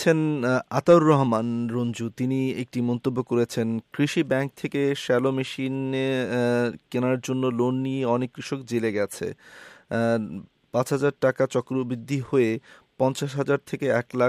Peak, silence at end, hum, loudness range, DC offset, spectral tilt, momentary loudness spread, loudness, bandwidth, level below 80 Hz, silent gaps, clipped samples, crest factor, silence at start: -6 dBFS; 0 s; none; 4 LU; under 0.1%; -6.5 dB/octave; 6 LU; -25 LUFS; 14.5 kHz; -68 dBFS; none; under 0.1%; 18 dB; 0 s